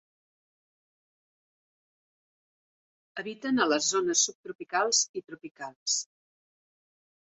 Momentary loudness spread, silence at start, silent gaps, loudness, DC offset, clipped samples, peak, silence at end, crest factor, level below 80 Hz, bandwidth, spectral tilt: 18 LU; 3.15 s; 4.35-4.44 s, 4.55-4.59 s, 5.09-5.14 s, 5.51-5.55 s, 5.76-5.86 s; -27 LUFS; under 0.1%; under 0.1%; -12 dBFS; 1.35 s; 22 dB; -78 dBFS; 8.4 kHz; -0.5 dB/octave